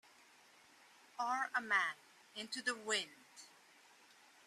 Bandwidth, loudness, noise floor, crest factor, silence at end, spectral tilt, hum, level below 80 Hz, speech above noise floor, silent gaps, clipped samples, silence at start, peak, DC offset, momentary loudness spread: 14.5 kHz; -39 LUFS; -66 dBFS; 22 dB; 1 s; -0.5 dB/octave; none; under -90 dBFS; 26 dB; none; under 0.1%; 1.2 s; -22 dBFS; under 0.1%; 23 LU